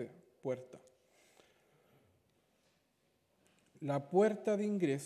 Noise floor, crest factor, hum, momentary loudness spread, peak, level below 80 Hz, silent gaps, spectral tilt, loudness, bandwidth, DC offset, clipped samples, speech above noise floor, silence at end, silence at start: -77 dBFS; 22 dB; none; 16 LU; -18 dBFS; -88 dBFS; none; -7 dB/octave; -36 LUFS; 13.5 kHz; under 0.1%; under 0.1%; 43 dB; 0 s; 0 s